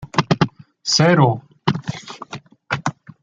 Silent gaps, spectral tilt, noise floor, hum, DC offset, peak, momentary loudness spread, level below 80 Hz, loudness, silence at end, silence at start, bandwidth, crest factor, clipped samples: none; -5 dB/octave; -37 dBFS; none; under 0.1%; 0 dBFS; 19 LU; -52 dBFS; -19 LUFS; 0.3 s; 0 s; 7.8 kHz; 20 dB; under 0.1%